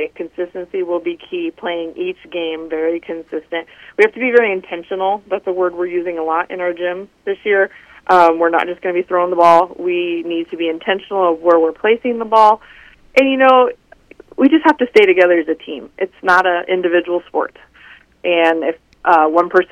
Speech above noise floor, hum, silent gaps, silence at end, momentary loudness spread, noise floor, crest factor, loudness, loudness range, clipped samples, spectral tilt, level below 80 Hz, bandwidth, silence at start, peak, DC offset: 29 dB; none; none; 0.1 s; 14 LU; -44 dBFS; 16 dB; -15 LUFS; 6 LU; under 0.1%; -5.5 dB/octave; -58 dBFS; 9.8 kHz; 0 s; 0 dBFS; under 0.1%